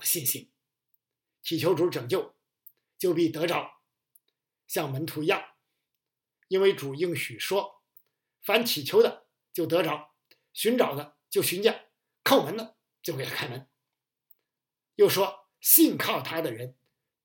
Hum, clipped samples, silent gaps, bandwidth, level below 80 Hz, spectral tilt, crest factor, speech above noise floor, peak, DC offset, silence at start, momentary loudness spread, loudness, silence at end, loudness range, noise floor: none; under 0.1%; none; 17 kHz; -82 dBFS; -3.5 dB/octave; 26 dB; 63 dB; -2 dBFS; under 0.1%; 0 s; 16 LU; -26 LUFS; 0.55 s; 6 LU; -89 dBFS